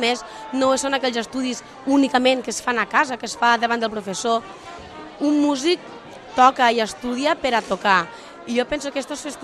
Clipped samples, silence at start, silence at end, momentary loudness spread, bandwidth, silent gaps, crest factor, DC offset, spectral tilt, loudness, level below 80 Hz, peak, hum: under 0.1%; 0 s; 0 s; 13 LU; 13 kHz; none; 20 dB; under 0.1%; -3 dB/octave; -21 LUFS; -56 dBFS; -2 dBFS; none